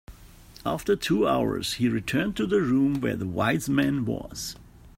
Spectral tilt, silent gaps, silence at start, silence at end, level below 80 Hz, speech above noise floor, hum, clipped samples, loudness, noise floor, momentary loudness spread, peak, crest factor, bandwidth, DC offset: -5.5 dB/octave; none; 0.1 s; 0.1 s; -50 dBFS; 24 dB; none; under 0.1%; -26 LUFS; -49 dBFS; 11 LU; -10 dBFS; 16 dB; 16 kHz; under 0.1%